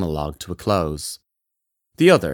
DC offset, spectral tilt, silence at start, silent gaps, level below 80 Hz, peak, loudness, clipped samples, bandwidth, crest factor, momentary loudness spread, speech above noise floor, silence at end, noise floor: under 0.1%; -5.5 dB/octave; 0 s; none; -44 dBFS; -2 dBFS; -21 LUFS; under 0.1%; 18 kHz; 20 dB; 15 LU; 60 dB; 0 s; -79 dBFS